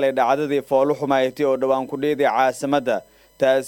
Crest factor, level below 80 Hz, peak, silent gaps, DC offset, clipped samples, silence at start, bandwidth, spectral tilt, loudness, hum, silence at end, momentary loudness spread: 16 dB; -64 dBFS; -4 dBFS; none; under 0.1%; under 0.1%; 0 s; 17 kHz; -5 dB/octave; -20 LUFS; none; 0 s; 4 LU